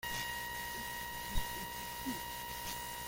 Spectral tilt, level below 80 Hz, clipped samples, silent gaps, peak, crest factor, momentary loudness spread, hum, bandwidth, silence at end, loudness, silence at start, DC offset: -2 dB/octave; -50 dBFS; under 0.1%; none; -22 dBFS; 18 dB; 3 LU; 60 Hz at -60 dBFS; 17 kHz; 0 s; -41 LUFS; 0 s; under 0.1%